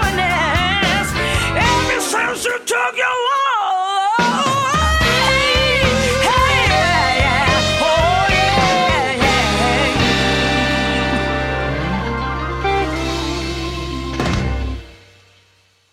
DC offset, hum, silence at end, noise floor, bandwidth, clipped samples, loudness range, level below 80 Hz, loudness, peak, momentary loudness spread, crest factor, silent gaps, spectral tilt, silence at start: under 0.1%; none; 0.95 s; -55 dBFS; 16.5 kHz; under 0.1%; 7 LU; -28 dBFS; -16 LUFS; -4 dBFS; 8 LU; 12 dB; none; -4 dB/octave; 0 s